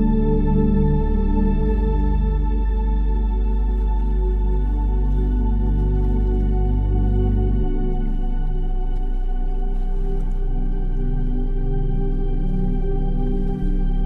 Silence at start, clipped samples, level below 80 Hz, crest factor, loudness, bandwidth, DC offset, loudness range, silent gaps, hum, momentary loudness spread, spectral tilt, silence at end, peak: 0 s; under 0.1%; -18 dBFS; 12 dB; -23 LUFS; 3.7 kHz; under 0.1%; 6 LU; none; none; 7 LU; -11 dB/octave; 0 s; -6 dBFS